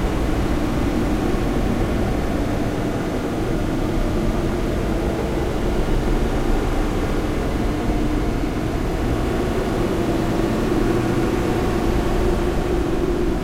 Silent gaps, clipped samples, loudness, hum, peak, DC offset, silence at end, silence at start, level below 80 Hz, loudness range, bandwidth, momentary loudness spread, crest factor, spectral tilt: none; under 0.1%; -22 LUFS; none; -6 dBFS; under 0.1%; 0 s; 0 s; -24 dBFS; 2 LU; 16 kHz; 2 LU; 12 dB; -6.5 dB/octave